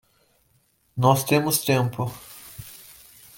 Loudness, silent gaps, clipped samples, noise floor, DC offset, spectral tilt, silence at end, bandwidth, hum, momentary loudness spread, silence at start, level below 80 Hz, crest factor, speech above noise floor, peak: -22 LUFS; none; under 0.1%; -65 dBFS; under 0.1%; -5 dB/octave; 0.6 s; 17 kHz; none; 21 LU; 0.95 s; -60 dBFS; 20 dB; 44 dB; -4 dBFS